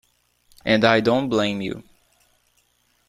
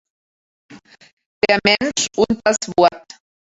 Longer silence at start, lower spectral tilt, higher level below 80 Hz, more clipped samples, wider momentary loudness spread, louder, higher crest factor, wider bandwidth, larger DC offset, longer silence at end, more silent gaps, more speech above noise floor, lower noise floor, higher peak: about the same, 0.65 s vs 0.7 s; first, -5.5 dB/octave vs -2.5 dB/octave; about the same, -56 dBFS vs -52 dBFS; neither; first, 15 LU vs 4 LU; second, -20 LUFS vs -17 LUFS; about the same, 22 dB vs 20 dB; first, 13.5 kHz vs 8.4 kHz; neither; first, 1.3 s vs 0.5 s; second, none vs 1.13-1.17 s, 1.26-1.41 s; second, 45 dB vs over 73 dB; second, -65 dBFS vs under -90 dBFS; about the same, -2 dBFS vs 0 dBFS